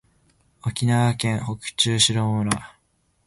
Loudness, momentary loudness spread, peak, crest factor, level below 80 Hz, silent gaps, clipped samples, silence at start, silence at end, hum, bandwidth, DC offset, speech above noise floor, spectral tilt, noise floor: -22 LUFS; 12 LU; 0 dBFS; 22 dB; -50 dBFS; none; under 0.1%; 0.65 s; 0.6 s; none; 12 kHz; under 0.1%; 45 dB; -4 dB/octave; -67 dBFS